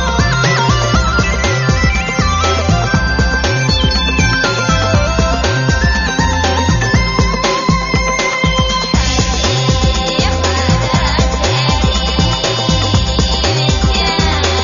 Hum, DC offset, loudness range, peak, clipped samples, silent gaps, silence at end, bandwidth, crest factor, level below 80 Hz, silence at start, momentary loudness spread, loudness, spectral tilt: none; under 0.1%; 0 LU; 0 dBFS; under 0.1%; none; 0 s; 7.4 kHz; 12 dB; -18 dBFS; 0 s; 2 LU; -13 LUFS; -3.5 dB/octave